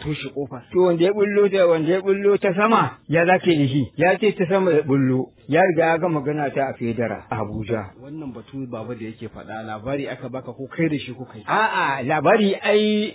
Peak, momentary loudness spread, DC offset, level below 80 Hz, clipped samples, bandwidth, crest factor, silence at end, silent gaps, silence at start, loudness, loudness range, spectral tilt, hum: -4 dBFS; 15 LU; under 0.1%; -54 dBFS; under 0.1%; 4 kHz; 16 dB; 0 s; none; 0 s; -20 LUFS; 11 LU; -10.5 dB/octave; none